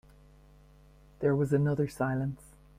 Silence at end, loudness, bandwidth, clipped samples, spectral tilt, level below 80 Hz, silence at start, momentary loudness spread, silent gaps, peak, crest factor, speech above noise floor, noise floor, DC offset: 0.45 s; -30 LUFS; 14 kHz; under 0.1%; -8.5 dB/octave; -58 dBFS; 1.2 s; 9 LU; none; -16 dBFS; 16 dB; 29 dB; -57 dBFS; under 0.1%